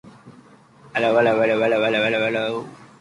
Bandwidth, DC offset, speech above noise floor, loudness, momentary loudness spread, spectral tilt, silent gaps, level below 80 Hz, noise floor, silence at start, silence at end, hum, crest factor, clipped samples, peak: 11.5 kHz; under 0.1%; 30 dB; -20 LUFS; 11 LU; -5.5 dB/octave; none; -64 dBFS; -49 dBFS; 0.05 s; 0.15 s; none; 16 dB; under 0.1%; -6 dBFS